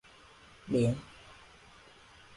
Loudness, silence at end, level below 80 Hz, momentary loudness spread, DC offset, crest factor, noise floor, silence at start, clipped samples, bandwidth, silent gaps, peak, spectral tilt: -32 LUFS; 1.05 s; -60 dBFS; 26 LU; under 0.1%; 18 dB; -57 dBFS; 0.65 s; under 0.1%; 11.5 kHz; none; -20 dBFS; -7.5 dB/octave